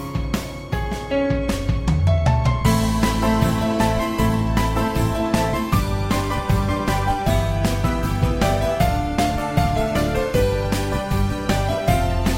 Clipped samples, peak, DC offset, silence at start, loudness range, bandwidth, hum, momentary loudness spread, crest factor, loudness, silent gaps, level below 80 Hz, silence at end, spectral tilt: under 0.1%; -4 dBFS; under 0.1%; 0 s; 2 LU; 16.5 kHz; none; 4 LU; 16 dB; -21 LUFS; none; -26 dBFS; 0 s; -6 dB/octave